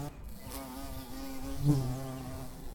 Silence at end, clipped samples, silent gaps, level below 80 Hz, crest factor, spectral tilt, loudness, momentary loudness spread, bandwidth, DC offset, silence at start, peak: 0 s; under 0.1%; none; -46 dBFS; 20 dB; -6.5 dB/octave; -37 LUFS; 14 LU; 17.5 kHz; under 0.1%; 0 s; -16 dBFS